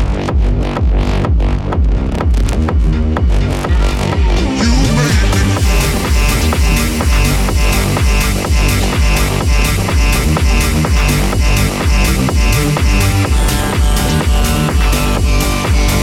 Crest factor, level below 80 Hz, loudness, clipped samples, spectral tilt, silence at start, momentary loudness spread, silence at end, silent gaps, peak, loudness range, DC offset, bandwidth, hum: 10 dB; -14 dBFS; -13 LUFS; under 0.1%; -5 dB/octave; 0 s; 3 LU; 0 s; none; 0 dBFS; 2 LU; under 0.1%; 16.5 kHz; none